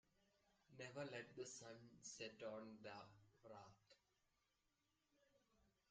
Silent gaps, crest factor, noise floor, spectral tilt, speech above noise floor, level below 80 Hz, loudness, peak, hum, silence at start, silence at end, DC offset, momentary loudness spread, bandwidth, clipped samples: none; 20 dB; -88 dBFS; -3.5 dB/octave; 31 dB; -90 dBFS; -57 LUFS; -40 dBFS; none; 0.2 s; 0.2 s; under 0.1%; 11 LU; 9 kHz; under 0.1%